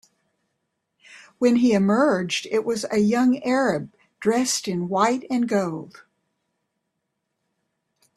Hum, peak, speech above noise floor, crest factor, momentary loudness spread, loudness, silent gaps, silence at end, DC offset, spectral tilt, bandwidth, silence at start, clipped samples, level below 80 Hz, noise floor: none; -4 dBFS; 57 dB; 20 dB; 7 LU; -22 LUFS; none; 2.25 s; under 0.1%; -5 dB/octave; 13 kHz; 1.1 s; under 0.1%; -66 dBFS; -78 dBFS